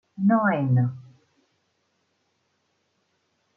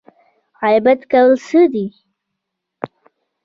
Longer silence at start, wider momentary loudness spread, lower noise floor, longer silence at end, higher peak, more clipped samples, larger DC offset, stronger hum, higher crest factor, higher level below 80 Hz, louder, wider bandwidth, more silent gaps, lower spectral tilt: second, 0.2 s vs 0.6 s; second, 10 LU vs 19 LU; second, -72 dBFS vs -78 dBFS; first, 2.55 s vs 0.6 s; second, -8 dBFS vs -2 dBFS; neither; neither; neither; about the same, 18 dB vs 14 dB; second, -72 dBFS vs -64 dBFS; second, -22 LUFS vs -14 LUFS; second, 3.2 kHz vs 7.6 kHz; neither; first, -11 dB/octave vs -6.5 dB/octave